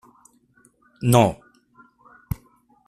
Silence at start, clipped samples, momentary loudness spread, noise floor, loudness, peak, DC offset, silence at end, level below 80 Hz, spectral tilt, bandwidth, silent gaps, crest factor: 1 s; under 0.1%; 17 LU; -59 dBFS; -22 LUFS; -4 dBFS; under 0.1%; 0.55 s; -48 dBFS; -6 dB/octave; 14.5 kHz; none; 22 dB